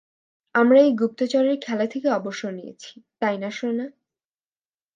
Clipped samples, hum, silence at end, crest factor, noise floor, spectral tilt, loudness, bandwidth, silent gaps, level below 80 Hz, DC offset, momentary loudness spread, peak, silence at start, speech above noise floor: under 0.1%; none; 1.05 s; 18 dB; under -90 dBFS; -5.5 dB/octave; -22 LUFS; 7.6 kHz; none; -76 dBFS; under 0.1%; 20 LU; -6 dBFS; 0.55 s; over 68 dB